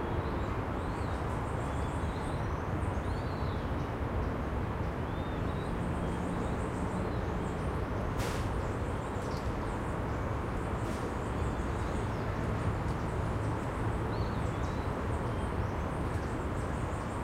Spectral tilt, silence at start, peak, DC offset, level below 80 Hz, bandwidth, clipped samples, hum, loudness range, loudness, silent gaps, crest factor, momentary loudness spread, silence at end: -7 dB/octave; 0 s; -20 dBFS; under 0.1%; -40 dBFS; 15.5 kHz; under 0.1%; none; 1 LU; -35 LUFS; none; 14 dB; 2 LU; 0 s